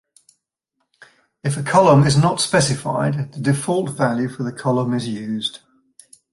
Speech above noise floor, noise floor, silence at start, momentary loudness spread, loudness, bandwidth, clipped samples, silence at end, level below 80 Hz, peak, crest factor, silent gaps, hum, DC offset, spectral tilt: 56 dB; -74 dBFS; 1.45 s; 12 LU; -19 LUFS; 11.5 kHz; under 0.1%; 0.75 s; -54 dBFS; -2 dBFS; 18 dB; none; none; under 0.1%; -5.5 dB/octave